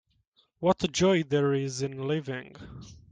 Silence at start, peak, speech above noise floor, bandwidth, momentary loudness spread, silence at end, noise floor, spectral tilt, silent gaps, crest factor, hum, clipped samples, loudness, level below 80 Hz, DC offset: 0.6 s; -10 dBFS; 41 dB; 9.6 kHz; 22 LU; 0.2 s; -69 dBFS; -5.5 dB/octave; none; 18 dB; none; under 0.1%; -28 LUFS; -58 dBFS; under 0.1%